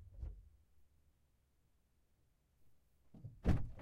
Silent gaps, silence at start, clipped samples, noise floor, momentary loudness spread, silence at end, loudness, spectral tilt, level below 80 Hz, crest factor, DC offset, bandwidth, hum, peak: none; 0 s; under 0.1%; -77 dBFS; 19 LU; 0 s; -43 LUFS; -8.5 dB/octave; -52 dBFS; 24 dB; under 0.1%; 9.8 kHz; none; -20 dBFS